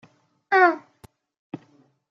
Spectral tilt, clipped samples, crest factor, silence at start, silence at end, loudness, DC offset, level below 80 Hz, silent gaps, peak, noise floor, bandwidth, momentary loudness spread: -6 dB/octave; under 0.1%; 22 dB; 0.5 s; 0.55 s; -19 LUFS; under 0.1%; -72 dBFS; 1.39-1.50 s; -4 dBFS; -60 dBFS; 6.6 kHz; 23 LU